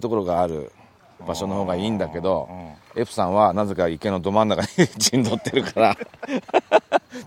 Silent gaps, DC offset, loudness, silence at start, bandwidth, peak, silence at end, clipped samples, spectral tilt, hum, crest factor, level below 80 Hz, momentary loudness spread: none; under 0.1%; -22 LUFS; 0 s; 16.5 kHz; -2 dBFS; 0 s; under 0.1%; -4.5 dB/octave; none; 20 dB; -56 dBFS; 12 LU